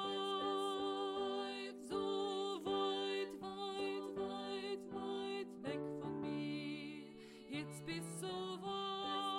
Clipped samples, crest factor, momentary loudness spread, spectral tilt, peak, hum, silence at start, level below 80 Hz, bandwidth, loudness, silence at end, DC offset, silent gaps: under 0.1%; 14 dB; 7 LU; -4.5 dB/octave; -28 dBFS; none; 0 s; -76 dBFS; 15 kHz; -43 LUFS; 0 s; under 0.1%; none